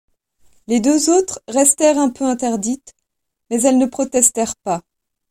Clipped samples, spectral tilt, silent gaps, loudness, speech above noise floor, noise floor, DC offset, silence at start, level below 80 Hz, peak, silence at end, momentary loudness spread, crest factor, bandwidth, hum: under 0.1%; -3 dB/octave; none; -16 LUFS; 62 dB; -78 dBFS; under 0.1%; 0.7 s; -56 dBFS; 0 dBFS; 0.5 s; 10 LU; 18 dB; 16 kHz; none